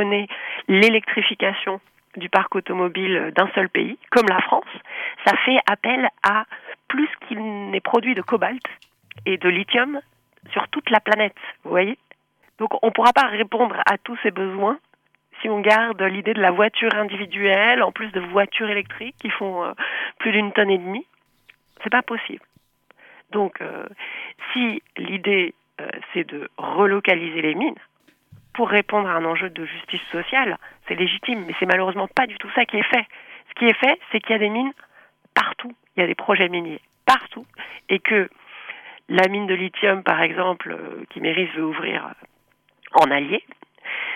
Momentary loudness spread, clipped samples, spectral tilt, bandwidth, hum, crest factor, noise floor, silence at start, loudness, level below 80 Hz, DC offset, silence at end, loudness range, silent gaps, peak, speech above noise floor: 15 LU; under 0.1%; -5 dB/octave; 15 kHz; none; 20 dB; -63 dBFS; 0 s; -20 LUFS; -68 dBFS; under 0.1%; 0 s; 4 LU; none; -2 dBFS; 42 dB